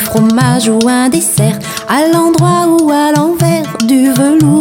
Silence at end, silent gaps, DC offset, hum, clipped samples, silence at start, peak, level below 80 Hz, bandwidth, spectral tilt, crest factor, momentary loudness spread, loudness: 0 s; none; under 0.1%; none; under 0.1%; 0 s; 0 dBFS; -44 dBFS; 17.5 kHz; -5.5 dB/octave; 8 dB; 4 LU; -10 LUFS